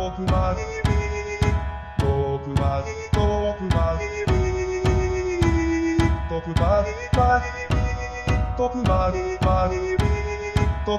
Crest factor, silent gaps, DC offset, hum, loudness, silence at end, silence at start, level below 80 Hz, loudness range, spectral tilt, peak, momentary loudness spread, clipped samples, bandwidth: 16 dB; none; 0.2%; none; -23 LUFS; 0 s; 0 s; -28 dBFS; 2 LU; -7 dB/octave; -6 dBFS; 5 LU; under 0.1%; 11.5 kHz